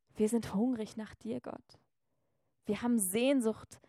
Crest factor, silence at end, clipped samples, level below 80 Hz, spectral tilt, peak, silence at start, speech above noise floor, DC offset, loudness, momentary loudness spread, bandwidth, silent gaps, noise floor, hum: 18 dB; 0.15 s; under 0.1%; -70 dBFS; -4.5 dB/octave; -18 dBFS; 0.15 s; 50 dB; under 0.1%; -34 LUFS; 15 LU; 16 kHz; none; -84 dBFS; none